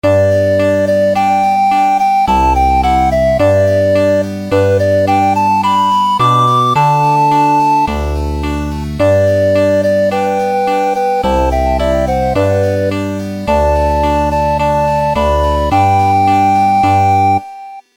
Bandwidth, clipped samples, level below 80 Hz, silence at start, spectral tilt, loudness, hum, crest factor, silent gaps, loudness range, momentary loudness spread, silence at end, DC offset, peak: 17.5 kHz; under 0.1%; -26 dBFS; 0.05 s; -6.5 dB/octave; -12 LUFS; none; 10 dB; none; 3 LU; 5 LU; 0.15 s; under 0.1%; -2 dBFS